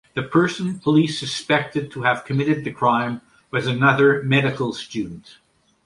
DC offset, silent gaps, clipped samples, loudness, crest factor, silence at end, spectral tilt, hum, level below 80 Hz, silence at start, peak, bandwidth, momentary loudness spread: under 0.1%; none; under 0.1%; -20 LUFS; 18 dB; 0.65 s; -6 dB/octave; none; -58 dBFS; 0.15 s; -2 dBFS; 11.5 kHz; 12 LU